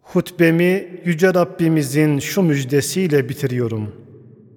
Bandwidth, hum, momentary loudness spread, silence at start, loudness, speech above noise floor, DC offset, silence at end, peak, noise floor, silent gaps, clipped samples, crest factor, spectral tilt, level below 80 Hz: 18.5 kHz; none; 7 LU; 0.1 s; -18 LUFS; 26 dB; under 0.1%; 0.55 s; -2 dBFS; -43 dBFS; none; under 0.1%; 16 dB; -6 dB/octave; -60 dBFS